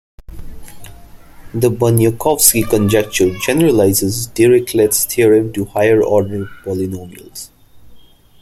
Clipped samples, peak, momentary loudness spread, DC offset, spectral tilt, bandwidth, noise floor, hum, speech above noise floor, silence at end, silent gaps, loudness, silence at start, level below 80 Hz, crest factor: under 0.1%; 0 dBFS; 16 LU; under 0.1%; -4.5 dB/octave; 16.5 kHz; -41 dBFS; none; 28 dB; 0.4 s; none; -13 LUFS; 0.3 s; -40 dBFS; 16 dB